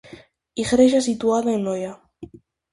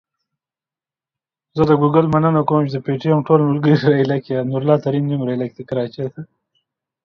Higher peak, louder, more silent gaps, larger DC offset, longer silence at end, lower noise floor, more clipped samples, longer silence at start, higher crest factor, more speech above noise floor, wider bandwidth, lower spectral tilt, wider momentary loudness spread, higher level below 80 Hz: second, -4 dBFS vs 0 dBFS; second, -20 LUFS vs -17 LUFS; neither; neither; second, 0.5 s vs 0.8 s; second, -46 dBFS vs under -90 dBFS; neither; second, 0.1 s vs 1.55 s; about the same, 18 dB vs 18 dB; second, 27 dB vs over 74 dB; first, 11.5 kHz vs 6.2 kHz; second, -5 dB/octave vs -9.5 dB/octave; first, 18 LU vs 10 LU; about the same, -54 dBFS vs -54 dBFS